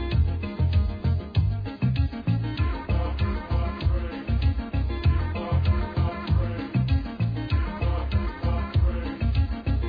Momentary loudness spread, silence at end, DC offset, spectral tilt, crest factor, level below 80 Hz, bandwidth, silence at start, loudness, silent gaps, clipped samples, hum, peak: 3 LU; 0 s; under 0.1%; -10 dB/octave; 14 dB; -28 dBFS; 5 kHz; 0 s; -26 LUFS; none; under 0.1%; none; -10 dBFS